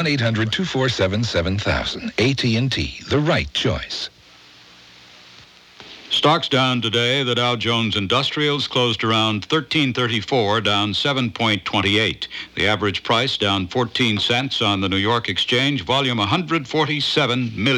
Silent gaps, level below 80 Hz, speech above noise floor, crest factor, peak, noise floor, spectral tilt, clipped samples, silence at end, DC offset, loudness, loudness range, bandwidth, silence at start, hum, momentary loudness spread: none; -44 dBFS; 28 dB; 16 dB; -4 dBFS; -47 dBFS; -5 dB/octave; under 0.1%; 0 s; under 0.1%; -19 LUFS; 4 LU; 13 kHz; 0 s; none; 4 LU